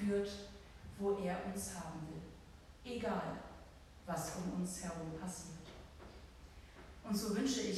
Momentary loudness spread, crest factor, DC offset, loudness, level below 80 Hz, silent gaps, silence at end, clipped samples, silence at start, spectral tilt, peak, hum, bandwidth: 20 LU; 18 dB; under 0.1%; -42 LUFS; -60 dBFS; none; 0 s; under 0.1%; 0 s; -5 dB/octave; -26 dBFS; none; 15.5 kHz